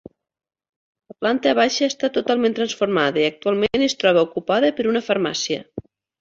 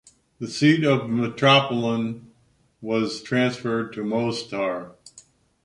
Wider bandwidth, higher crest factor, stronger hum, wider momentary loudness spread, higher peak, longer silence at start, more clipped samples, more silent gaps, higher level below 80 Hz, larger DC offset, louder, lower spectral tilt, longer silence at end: second, 7.8 kHz vs 11 kHz; about the same, 16 dB vs 20 dB; neither; second, 7 LU vs 16 LU; about the same, -4 dBFS vs -2 dBFS; first, 1.2 s vs 0.4 s; neither; neither; first, -58 dBFS vs -64 dBFS; neither; about the same, -20 LUFS vs -22 LUFS; second, -4 dB/octave vs -5.5 dB/octave; about the same, 0.4 s vs 0.45 s